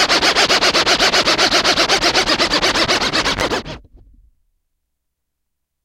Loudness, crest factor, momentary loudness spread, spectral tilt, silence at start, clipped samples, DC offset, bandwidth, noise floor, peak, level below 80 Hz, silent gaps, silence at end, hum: -13 LUFS; 16 dB; 6 LU; -1.5 dB/octave; 0 s; under 0.1%; under 0.1%; 16.5 kHz; -75 dBFS; 0 dBFS; -40 dBFS; none; 2.05 s; none